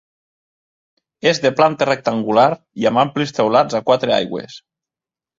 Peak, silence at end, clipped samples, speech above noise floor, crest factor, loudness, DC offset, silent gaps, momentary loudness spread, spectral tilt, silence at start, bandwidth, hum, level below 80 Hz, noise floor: -2 dBFS; 0.8 s; under 0.1%; 73 dB; 18 dB; -17 LUFS; under 0.1%; none; 5 LU; -5 dB/octave; 1.25 s; 7.8 kHz; none; -60 dBFS; -89 dBFS